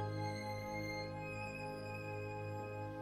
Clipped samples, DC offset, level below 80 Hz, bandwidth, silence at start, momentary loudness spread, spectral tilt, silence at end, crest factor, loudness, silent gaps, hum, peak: under 0.1%; under 0.1%; -64 dBFS; 15.5 kHz; 0 s; 3 LU; -6 dB/octave; 0 s; 14 dB; -44 LUFS; none; none; -30 dBFS